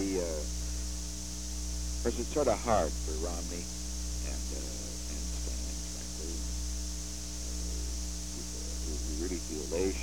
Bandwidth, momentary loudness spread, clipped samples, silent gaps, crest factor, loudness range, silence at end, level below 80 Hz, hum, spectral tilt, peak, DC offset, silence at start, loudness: 17.5 kHz; 8 LU; under 0.1%; none; 22 dB; 4 LU; 0 s; -38 dBFS; 60 Hz at -40 dBFS; -4 dB/octave; -14 dBFS; 0.5%; 0 s; -36 LUFS